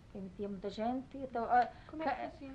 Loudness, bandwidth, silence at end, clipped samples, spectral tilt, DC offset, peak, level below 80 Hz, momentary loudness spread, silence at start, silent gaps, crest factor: -37 LUFS; 8.2 kHz; 0 s; under 0.1%; -7 dB/octave; under 0.1%; -20 dBFS; -62 dBFS; 11 LU; 0 s; none; 18 dB